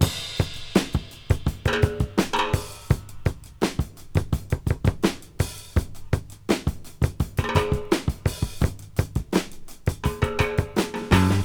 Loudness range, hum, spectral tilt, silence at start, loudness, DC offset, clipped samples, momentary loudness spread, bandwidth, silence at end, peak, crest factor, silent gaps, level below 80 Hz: 2 LU; none; -5.5 dB/octave; 0 s; -26 LUFS; 0.2%; under 0.1%; 6 LU; 20 kHz; 0 s; -4 dBFS; 20 dB; none; -34 dBFS